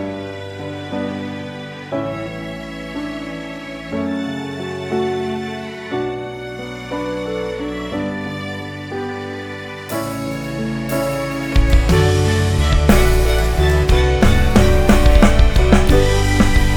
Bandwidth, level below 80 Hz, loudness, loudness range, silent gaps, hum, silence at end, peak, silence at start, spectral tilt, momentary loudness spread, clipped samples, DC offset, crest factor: 20 kHz; -20 dBFS; -19 LUFS; 12 LU; none; none; 0 s; 0 dBFS; 0 s; -6 dB/octave; 15 LU; under 0.1%; under 0.1%; 16 dB